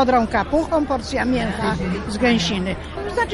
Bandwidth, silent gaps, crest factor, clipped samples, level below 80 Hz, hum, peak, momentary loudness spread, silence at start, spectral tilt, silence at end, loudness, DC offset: 11.5 kHz; none; 14 dB; under 0.1%; -34 dBFS; none; -6 dBFS; 7 LU; 0 s; -5.5 dB/octave; 0 s; -21 LUFS; under 0.1%